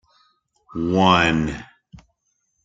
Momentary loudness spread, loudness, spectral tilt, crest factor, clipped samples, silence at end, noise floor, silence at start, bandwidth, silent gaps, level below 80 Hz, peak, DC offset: 19 LU; -18 LUFS; -5.5 dB/octave; 20 dB; under 0.1%; 1 s; -71 dBFS; 0.75 s; 7.8 kHz; none; -46 dBFS; -2 dBFS; under 0.1%